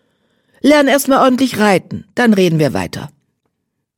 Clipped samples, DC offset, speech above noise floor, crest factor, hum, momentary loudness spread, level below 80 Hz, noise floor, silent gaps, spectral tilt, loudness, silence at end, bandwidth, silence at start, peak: under 0.1%; under 0.1%; 60 dB; 14 dB; none; 14 LU; -52 dBFS; -72 dBFS; none; -5 dB/octave; -13 LUFS; 0.9 s; 17.5 kHz; 0.65 s; 0 dBFS